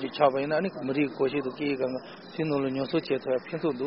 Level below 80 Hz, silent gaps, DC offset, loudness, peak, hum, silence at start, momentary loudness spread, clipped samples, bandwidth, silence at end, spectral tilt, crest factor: -66 dBFS; none; under 0.1%; -29 LUFS; -10 dBFS; none; 0 s; 7 LU; under 0.1%; 5.8 kHz; 0 s; -5 dB/octave; 18 dB